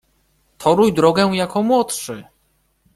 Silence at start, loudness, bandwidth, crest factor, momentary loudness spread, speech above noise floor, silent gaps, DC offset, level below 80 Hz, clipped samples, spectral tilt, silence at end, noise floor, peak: 0.6 s; -17 LUFS; 15 kHz; 18 dB; 13 LU; 47 dB; none; under 0.1%; -52 dBFS; under 0.1%; -5 dB/octave; 0.75 s; -63 dBFS; -2 dBFS